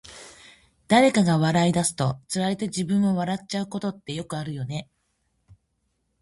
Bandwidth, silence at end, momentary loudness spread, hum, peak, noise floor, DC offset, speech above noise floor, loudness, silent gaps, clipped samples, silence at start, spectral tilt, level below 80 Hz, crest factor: 11.5 kHz; 1.4 s; 15 LU; none; -6 dBFS; -73 dBFS; under 0.1%; 50 dB; -24 LUFS; none; under 0.1%; 0.05 s; -5.5 dB/octave; -58 dBFS; 20 dB